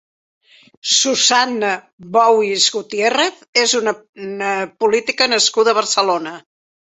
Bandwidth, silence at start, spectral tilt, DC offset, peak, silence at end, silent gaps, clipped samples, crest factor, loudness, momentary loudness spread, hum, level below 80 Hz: 8.4 kHz; 0.85 s; -1 dB/octave; under 0.1%; 0 dBFS; 0.45 s; 1.93-1.98 s, 3.48-3.53 s, 4.09-4.13 s; under 0.1%; 16 dB; -15 LUFS; 10 LU; none; -66 dBFS